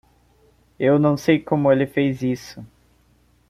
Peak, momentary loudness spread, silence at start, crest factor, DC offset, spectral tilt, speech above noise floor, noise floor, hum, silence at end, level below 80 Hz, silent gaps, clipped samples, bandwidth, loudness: -4 dBFS; 12 LU; 0.8 s; 18 dB; under 0.1%; -7.5 dB/octave; 40 dB; -59 dBFS; none; 0.85 s; -56 dBFS; none; under 0.1%; 14.5 kHz; -20 LUFS